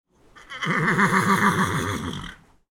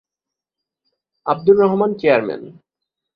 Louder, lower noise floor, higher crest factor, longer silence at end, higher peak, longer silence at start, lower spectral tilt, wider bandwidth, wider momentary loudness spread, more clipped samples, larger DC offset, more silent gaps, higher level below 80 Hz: second, -22 LUFS vs -16 LUFS; second, -45 dBFS vs -86 dBFS; about the same, 20 dB vs 18 dB; second, 0.4 s vs 0.65 s; about the same, -4 dBFS vs -2 dBFS; second, 0.35 s vs 1.25 s; second, -5 dB/octave vs -9.5 dB/octave; first, 17.5 kHz vs 5.2 kHz; about the same, 17 LU vs 15 LU; neither; neither; neither; first, -50 dBFS vs -62 dBFS